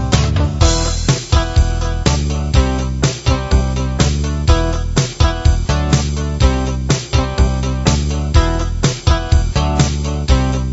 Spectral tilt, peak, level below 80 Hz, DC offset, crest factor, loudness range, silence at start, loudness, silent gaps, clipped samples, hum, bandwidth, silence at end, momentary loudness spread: -5 dB/octave; 0 dBFS; -18 dBFS; 0.2%; 14 dB; 1 LU; 0 s; -16 LUFS; none; under 0.1%; none; 8 kHz; 0 s; 3 LU